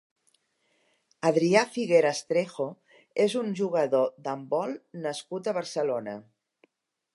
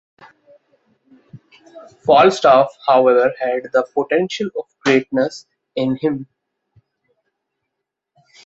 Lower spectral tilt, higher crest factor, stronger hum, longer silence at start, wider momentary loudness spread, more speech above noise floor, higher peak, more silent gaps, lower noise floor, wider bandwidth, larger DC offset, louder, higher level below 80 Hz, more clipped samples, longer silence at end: about the same, -5 dB/octave vs -5.5 dB/octave; about the same, 22 dB vs 18 dB; neither; about the same, 1.25 s vs 1.35 s; about the same, 12 LU vs 13 LU; second, 45 dB vs 63 dB; second, -6 dBFS vs -2 dBFS; neither; second, -72 dBFS vs -79 dBFS; first, 11.5 kHz vs 8 kHz; neither; second, -27 LUFS vs -16 LUFS; second, -80 dBFS vs -62 dBFS; neither; second, 0.95 s vs 2.2 s